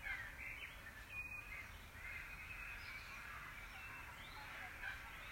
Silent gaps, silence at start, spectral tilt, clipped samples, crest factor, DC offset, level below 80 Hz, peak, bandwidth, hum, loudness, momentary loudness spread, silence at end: none; 0 s; -3 dB/octave; under 0.1%; 18 dB; under 0.1%; -62 dBFS; -34 dBFS; 16 kHz; none; -50 LUFS; 4 LU; 0 s